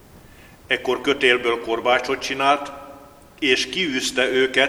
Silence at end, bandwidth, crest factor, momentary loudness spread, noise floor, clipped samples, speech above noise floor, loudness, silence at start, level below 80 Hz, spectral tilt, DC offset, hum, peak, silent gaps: 0 s; 16 kHz; 20 dB; 7 LU; -46 dBFS; under 0.1%; 26 dB; -20 LUFS; 0.15 s; -54 dBFS; -2.5 dB/octave; under 0.1%; none; -2 dBFS; none